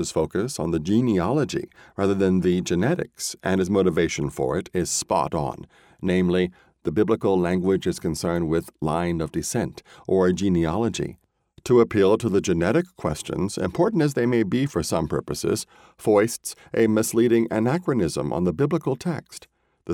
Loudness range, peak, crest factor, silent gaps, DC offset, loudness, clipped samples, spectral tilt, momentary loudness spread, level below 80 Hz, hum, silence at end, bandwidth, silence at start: 2 LU; -6 dBFS; 16 dB; none; under 0.1%; -23 LUFS; under 0.1%; -6 dB/octave; 9 LU; -48 dBFS; none; 0 s; 17 kHz; 0 s